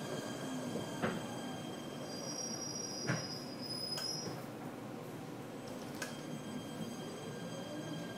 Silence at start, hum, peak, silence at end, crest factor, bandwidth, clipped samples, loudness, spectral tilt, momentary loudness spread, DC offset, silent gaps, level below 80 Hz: 0 s; none; -22 dBFS; 0 s; 20 dB; 16 kHz; under 0.1%; -42 LUFS; -4 dB/octave; 8 LU; under 0.1%; none; -74 dBFS